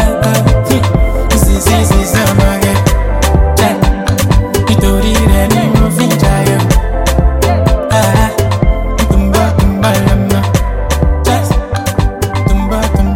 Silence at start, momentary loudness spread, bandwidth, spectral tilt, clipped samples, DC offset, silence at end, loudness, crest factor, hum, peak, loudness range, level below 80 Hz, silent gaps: 0 s; 4 LU; 17 kHz; -5.5 dB/octave; under 0.1%; under 0.1%; 0 s; -11 LUFS; 10 dB; none; 0 dBFS; 1 LU; -14 dBFS; none